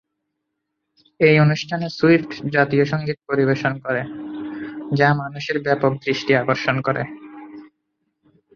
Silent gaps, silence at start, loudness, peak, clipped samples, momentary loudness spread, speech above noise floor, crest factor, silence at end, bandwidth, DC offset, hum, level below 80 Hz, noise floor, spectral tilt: none; 1.2 s; -19 LUFS; -2 dBFS; under 0.1%; 15 LU; 58 dB; 20 dB; 0.9 s; 7 kHz; under 0.1%; none; -60 dBFS; -77 dBFS; -7 dB/octave